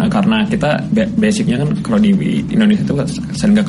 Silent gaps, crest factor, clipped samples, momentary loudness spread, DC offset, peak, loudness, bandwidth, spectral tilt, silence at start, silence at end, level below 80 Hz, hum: none; 10 dB; under 0.1%; 4 LU; under 0.1%; -4 dBFS; -15 LUFS; 11.5 kHz; -6.5 dB/octave; 0 s; 0 s; -38 dBFS; none